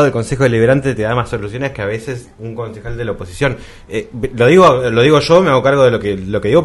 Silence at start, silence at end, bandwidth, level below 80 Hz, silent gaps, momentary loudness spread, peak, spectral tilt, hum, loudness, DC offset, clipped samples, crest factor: 0 s; 0 s; 12 kHz; -36 dBFS; none; 16 LU; 0 dBFS; -6.5 dB/octave; none; -13 LUFS; under 0.1%; under 0.1%; 14 dB